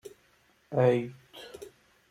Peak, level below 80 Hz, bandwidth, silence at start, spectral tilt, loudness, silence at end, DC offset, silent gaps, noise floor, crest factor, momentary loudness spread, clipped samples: -12 dBFS; -72 dBFS; 14.5 kHz; 0.05 s; -7.5 dB/octave; -27 LUFS; 0.4 s; under 0.1%; none; -66 dBFS; 20 dB; 24 LU; under 0.1%